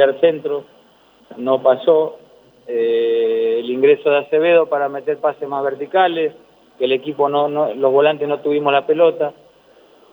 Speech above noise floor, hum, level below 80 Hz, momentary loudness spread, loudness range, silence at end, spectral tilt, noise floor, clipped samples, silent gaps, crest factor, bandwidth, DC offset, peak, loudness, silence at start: 35 dB; none; -72 dBFS; 10 LU; 2 LU; 0.8 s; -7.5 dB/octave; -51 dBFS; under 0.1%; none; 16 dB; over 20 kHz; under 0.1%; 0 dBFS; -17 LUFS; 0 s